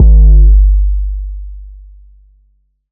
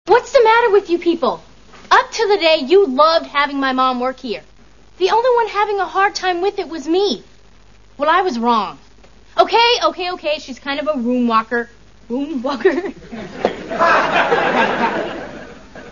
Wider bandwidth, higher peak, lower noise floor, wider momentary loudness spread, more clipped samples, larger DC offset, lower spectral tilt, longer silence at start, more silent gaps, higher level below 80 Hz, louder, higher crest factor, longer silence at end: second, 0.8 kHz vs 7.4 kHz; about the same, 0 dBFS vs 0 dBFS; first, -55 dBFS vs -48 dBFS; first, 23 LU vs 14 LU; neither; second, under 0.1% vs 0.5%; first, -18 dB/octave vs -3.5 dB/octave; about the same, 0 s vs 0.05 s; neither; first, -8 dBFS vs -50 dBFS; first, -10 LUFS vs -16 LUFS; second, 8 dB vs 16 dB; first, 1.2 s vs 0 s